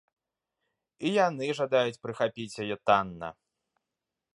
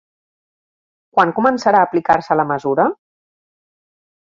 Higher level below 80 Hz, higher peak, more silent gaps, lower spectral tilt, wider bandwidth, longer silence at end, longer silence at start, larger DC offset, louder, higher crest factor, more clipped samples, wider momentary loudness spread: second, -68 dBFS vs -58 dBFS; second, -8 dBFS vs 0 dBFS; neither; second, -5 dB/octave vs -6.5 dB/octave; first, 11.5 kHz vs 7.6 kHz; second, 1 s vs 1.4 s; second, 1 s vs 1.15 s; neither; second, -29 LUFS vs -16 LUFS; about the same, 22 dB vs 18 dB; neither; first, 11 LU vs 6 LU